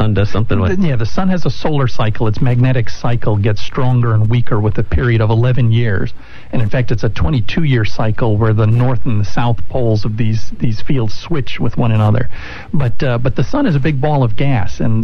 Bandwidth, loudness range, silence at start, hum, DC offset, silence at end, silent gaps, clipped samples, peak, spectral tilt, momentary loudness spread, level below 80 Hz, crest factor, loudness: 6.6 kHz; 3 LU; 0 s; none; under 0.1%; 0 s; none; under 0.1%; -2 dBFS; -8 dB/octave; 6 LU; -28 dBFS; 8 dB; -16 LUFS